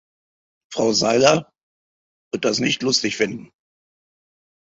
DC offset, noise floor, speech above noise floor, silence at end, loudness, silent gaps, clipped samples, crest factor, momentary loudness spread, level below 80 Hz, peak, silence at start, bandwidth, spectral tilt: under 0.1%; under -90 dBFS; over 71 dB; 1.3 s; -19 LUFS; 1.63-2.31 s; under 0.1%; 22 dB; 14 LU; -62 dBFS; -2 dBFS; 0.7 s; 8.2 kHz; -3.5 dB/octave